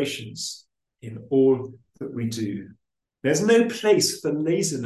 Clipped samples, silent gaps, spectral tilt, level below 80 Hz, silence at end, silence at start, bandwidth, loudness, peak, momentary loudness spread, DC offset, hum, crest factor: under 0.1%; none; -4.5 dB/octave; -66 dBFS; 0 s; 0 s; 12.5 kHz; -23 LUFS; -8 dBFS; 20 LU; under 0.1%; none; 16 dB